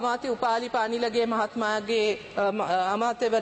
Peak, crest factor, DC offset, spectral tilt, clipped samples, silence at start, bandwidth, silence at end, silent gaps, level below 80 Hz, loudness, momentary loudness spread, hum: -12 dBFS; 14 dB; under 0.1%; -4 dB/octave; under 0.1%; 0 s; 8.8 kHz; 0 s; none; -64 dBFS; -26 LUFS; 3 LU; none